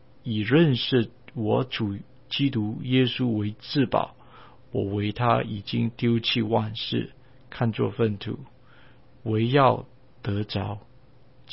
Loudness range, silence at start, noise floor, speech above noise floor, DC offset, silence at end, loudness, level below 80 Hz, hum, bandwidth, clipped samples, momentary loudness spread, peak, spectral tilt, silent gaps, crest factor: 3 LU; 0.25 s; -55 dBFS; 31 dB; 0.3%; 0 s; -25 LUFS; -56 dBFS; none; 5.8 kHz; under 0.1%; 14 LU; -6 dBFS; -10.5 dB/octave; none; 20 dB